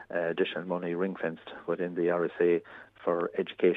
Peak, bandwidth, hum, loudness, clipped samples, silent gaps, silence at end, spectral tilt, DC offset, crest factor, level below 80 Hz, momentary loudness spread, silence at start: -12 dBFS; 4 kHz; none; -31 LUFS; under 0.1%; none; 0 s; -8.5 dB/octave; under 0.1%; 18 dB; -76 dBFS; 8 LU; 0 s